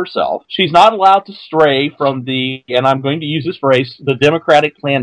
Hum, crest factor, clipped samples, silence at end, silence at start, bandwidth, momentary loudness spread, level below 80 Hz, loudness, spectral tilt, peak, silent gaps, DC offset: none; 14 dB; 0.5%; 0 s; 0 s; 11 kHz; 9 LU; -56 dBFS; -13 LUFS; -6 dB/octave; 0 dBFS; none; under 0.1%